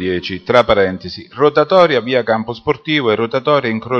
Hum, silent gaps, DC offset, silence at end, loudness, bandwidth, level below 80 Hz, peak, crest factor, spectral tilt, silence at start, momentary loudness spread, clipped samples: none; none; under 0.1%; 0 s; -14 LUFS; 6.8 kHz; -46 dBFS; 0 dBFS; 14 dB; -6.5 dB/octave; 0 s; 9 LU; under 0.1%